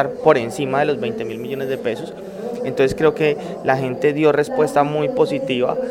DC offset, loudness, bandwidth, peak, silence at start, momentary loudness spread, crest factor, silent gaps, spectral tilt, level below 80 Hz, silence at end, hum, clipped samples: under 0.1%; -19 LUFS; 15.5 kHz; 0 dBFS; 0 s; 10 LU; 18 dB; none; -6 dB/octave; -52 dBFS; 0 s; none; under 0.1%